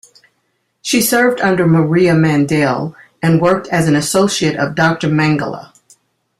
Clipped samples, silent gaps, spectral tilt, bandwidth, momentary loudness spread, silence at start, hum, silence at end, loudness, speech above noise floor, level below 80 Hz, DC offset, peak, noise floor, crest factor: under 0.1%; none; -5 dB/octave; 15.5 kHz; 8 LU; 0.85 s; none; 0.75 s; -14 LUFS; 53 dB; -50 dBFS; under 0.1%; 0 dBFS; -66 dBFS; 14 dB